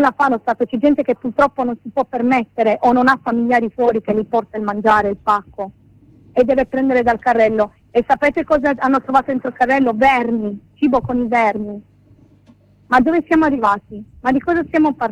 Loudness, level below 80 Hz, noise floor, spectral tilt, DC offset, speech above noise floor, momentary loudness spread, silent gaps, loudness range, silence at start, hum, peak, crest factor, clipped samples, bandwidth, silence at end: -16 LUFS; -46 dBFS; -50 dBFS; -7 dB/octave; under 0.1%; 34 dB; 8 LU; none; 2 LU; 0 s; none; -2 dBFS; 14 dB; under 0.1%; 10 kHz; 0 s